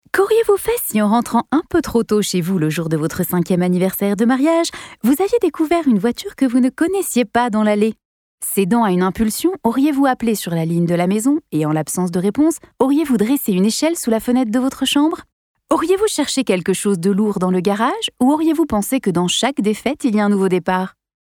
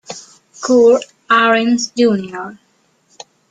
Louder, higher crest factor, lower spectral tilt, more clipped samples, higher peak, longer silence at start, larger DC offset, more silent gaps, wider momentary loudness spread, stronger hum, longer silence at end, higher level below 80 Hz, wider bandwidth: second, -17 LUFS vs -13 LUFS; about the same, 14 dB vs 16 dB; about the same, -5 dB/octave vs -4 dB/octave; neither; second, -4 dBFS vs 0 dBFS; about the same, 0.15 s vs 0.1 s; neither; first, 8.05-8.38 s, 15.33-15.55 s vs none; second, 4 LU vs 20 LU; neither; second, 0.3 s vs 0.95 s; first, -48 dBFS vs -62 dBFS; first, over 20 kHz vs 9.2 kHz